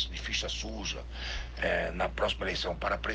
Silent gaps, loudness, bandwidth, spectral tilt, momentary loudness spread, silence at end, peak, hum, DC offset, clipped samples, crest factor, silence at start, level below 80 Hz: none; -33 LUFS; 9.4 kHz; -3.5 dB/octave; 7 LU; 0 s; -16 dBFS; none; under 0.1%; under 0.1%; 18 dB; 0 s; -40 dBFS